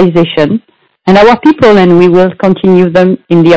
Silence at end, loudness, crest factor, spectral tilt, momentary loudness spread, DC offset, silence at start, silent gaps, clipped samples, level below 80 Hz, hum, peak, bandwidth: 0 s; -6 LUFS; 6 dB; -8 dB/octave; 7 LU; under 0.1%; 0 s; none; 10%; -40 dBFS; none; 0 dBFS; 8 kHz